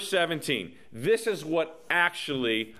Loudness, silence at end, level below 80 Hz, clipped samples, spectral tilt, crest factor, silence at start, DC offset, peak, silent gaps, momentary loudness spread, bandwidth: -27 LUFS; 0 s; -68 dBFS; under 0.1%; -3.5 dB/octave; 20 dB; 0 s; 0.2%; -8 dBFS; none; 6 LU; 15 kHz